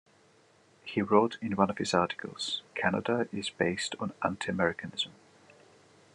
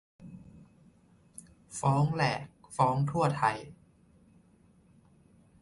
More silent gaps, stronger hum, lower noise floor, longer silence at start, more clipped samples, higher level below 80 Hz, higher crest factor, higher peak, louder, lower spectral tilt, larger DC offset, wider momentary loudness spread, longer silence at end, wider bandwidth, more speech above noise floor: neither; neither; about the same, -63 dBFS vs -63 dBFS; first, 0.85 s vs 0.2 s; neither; second, -74 dBFS vs -64 dBFS; about the same, 24 dB vs 22 dB; first, -8 dBFS vs -12 dBFS; about the same, -31 LUFS vs -30 LUFS; second, -4.5 dB/octave vs -6 dB/octave; neither; second, 9 LU vs 24 LU; second, 1.05 s vs 1.9 s; about the same, 11 kHz vs 11.5 kHz; about the same, 33 dB vs 34 dB